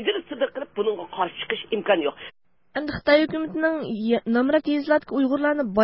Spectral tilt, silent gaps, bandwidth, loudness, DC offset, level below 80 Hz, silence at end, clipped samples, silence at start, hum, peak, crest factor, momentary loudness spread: -9.5 dB/octave; none; 5.8 kHz; -24 LUFS; 0.1%; -56 dBFS; 0 s; under 0.1%; 0 s; none; -6 dBFS; 18 dB; 10 LU